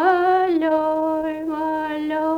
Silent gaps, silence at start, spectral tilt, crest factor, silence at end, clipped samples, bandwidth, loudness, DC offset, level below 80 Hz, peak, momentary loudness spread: none; 0 s; -6 dB/octave; 14 dB; 0 s; under 0.1%; 6.4 kHz; -21 LUFS; under 0.1%; -56 dBFS; -6 dBFS; 7 LU